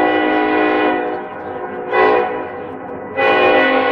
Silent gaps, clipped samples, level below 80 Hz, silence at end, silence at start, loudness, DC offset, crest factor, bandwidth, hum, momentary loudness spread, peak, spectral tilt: none; under 0.1%; -56 dBFS; 0 s; 0 s; -15 LUFS; under 0.1%; 14 dB; 6.2 kHz; none; 15 LU; -2 dBFS; -6.5 dB/octave